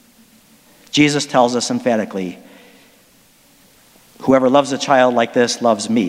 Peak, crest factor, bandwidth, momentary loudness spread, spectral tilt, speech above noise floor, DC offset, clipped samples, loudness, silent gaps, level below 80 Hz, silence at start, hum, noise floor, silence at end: 0 dBFS; 18 dB; 15.5 kHz; 10 LU; -4 dB/octave; 36 dB; under 0.1%; under 0.1%; -16 LUFS; none; -60 dBFS; 0.95 s; none; -51 dBFS; 0 s